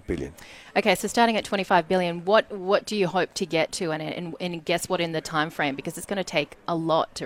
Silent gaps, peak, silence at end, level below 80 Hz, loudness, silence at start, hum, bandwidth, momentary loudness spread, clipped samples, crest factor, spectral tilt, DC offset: none; -6 dBFS; 0 s; -54 dBFS; -25 LUFS; 0.1 s; none; 16.5 kHz; 10 LU; under 0.1%; 20 dB; -4.5 dB/octave; under 0.1%